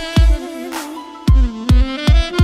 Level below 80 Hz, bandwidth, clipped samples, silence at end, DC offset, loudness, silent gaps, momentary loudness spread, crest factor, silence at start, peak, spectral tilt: -16 dBFS; 13.5 kHz; under 0.1%; 0 s; under 0.1%; -17 LUFS; none; 11 LU; 12 dB; 0 s; -2 dBFS; -6 dB/octave